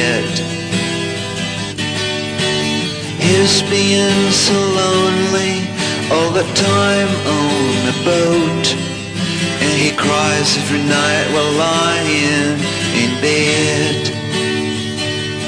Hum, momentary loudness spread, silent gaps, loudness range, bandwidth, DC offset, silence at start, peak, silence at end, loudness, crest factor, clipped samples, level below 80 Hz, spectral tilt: none; 7 LU; none; 2 LU; 11 kHz; under 0.1%; 0 s; -2 dBFS; 0 s; -15 LUFS; 12 dB; under 0.1%; -48 dBFS; -4 dB/octave